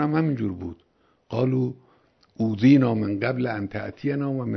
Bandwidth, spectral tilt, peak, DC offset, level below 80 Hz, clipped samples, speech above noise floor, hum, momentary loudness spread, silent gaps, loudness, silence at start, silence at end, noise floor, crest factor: 6.2 kHz; -9 dB/octave; -6 dBFS; under 0.1%; -58 dBFS; under 0.1%; 38 dB; none; 14 LU; none; -24 LUFS; 0 s; 0 s; -61 dBFS; 18 dB